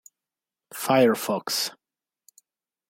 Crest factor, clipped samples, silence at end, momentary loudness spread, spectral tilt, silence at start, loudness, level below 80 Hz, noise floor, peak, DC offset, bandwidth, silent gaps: 20 dB; under 0.1%; 1.2 s; 12 LU; -3.5 dB/octave; 0.75 s; -24 LUFS; -74 dBFS; -90 dBFS; -8 dBFS; under 0.1%; 16.5 kHz; none